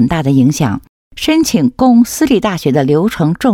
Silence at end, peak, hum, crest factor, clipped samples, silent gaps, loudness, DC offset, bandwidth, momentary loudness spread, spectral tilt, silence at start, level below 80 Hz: 0 s; 0 dBFS; none; 12 dB; under 0.1%; 0.89-1.11 s; -12 LUFS; under 0.1%; 16.5 kHz; 7 LU; -6 dB/octave; 0 s; -40 dBFS